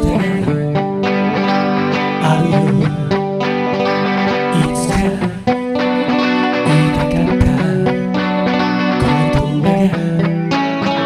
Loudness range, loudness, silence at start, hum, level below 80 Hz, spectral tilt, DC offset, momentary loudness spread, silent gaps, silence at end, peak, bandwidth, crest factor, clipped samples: 1 LU; -15 LUFS; 0 s; none; -32 dBFS; -6.5 dB/octave; under 0.1%; 4 LU; none; 0 s; 0 dBFS; 12.5 kHz; 14 dB; under 0.1%